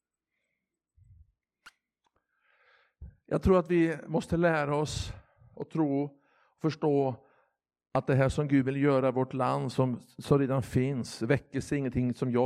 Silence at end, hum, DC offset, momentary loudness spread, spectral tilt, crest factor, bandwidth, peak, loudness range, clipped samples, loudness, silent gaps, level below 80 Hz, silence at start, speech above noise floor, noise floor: 0 s; none; under 0.1%; 9 LU; -7 dB/octave; 20 dB; 13 kHz; -10 dBFS; 4 LU; under 0.1%; -29 LUFS; none; -52 dBFS; 1.65 s; 57 dB; -85 dBFS